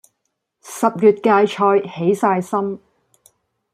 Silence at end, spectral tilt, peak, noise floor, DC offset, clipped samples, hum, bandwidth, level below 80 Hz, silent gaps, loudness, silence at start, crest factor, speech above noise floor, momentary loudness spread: 0.95 s; -6 dB/octave; -2 dBFS; -74 dBFS; under 0.1%; under 0.1%; none; 15 kHz; -66 dBFS; none; -17 LUFS; 0.65 s; 16 dB; 58 dB; 11 LU